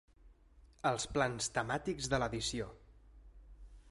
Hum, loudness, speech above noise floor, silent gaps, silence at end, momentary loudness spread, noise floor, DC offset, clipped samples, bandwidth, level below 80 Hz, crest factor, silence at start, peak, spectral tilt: none; -36 LUFS; 27 dB; none; 0 s; 4 LU; -63 dBFS; under 0.1%; under 0.1%; 11.5 kHz; -56 dBFS; 22 dB; 0.25 s; -18 dBFS; -3.5 dB/octave